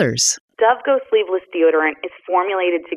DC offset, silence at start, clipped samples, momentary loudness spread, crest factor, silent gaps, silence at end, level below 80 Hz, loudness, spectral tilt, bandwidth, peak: under 0.1%; 0 s; under 0.1%; 6 LU; 14 dB; 0.40-0.48 s; 0 s; -62 dBFS; -18 LUFS; -3 dB/octave; 13 kHz; -4 dBFS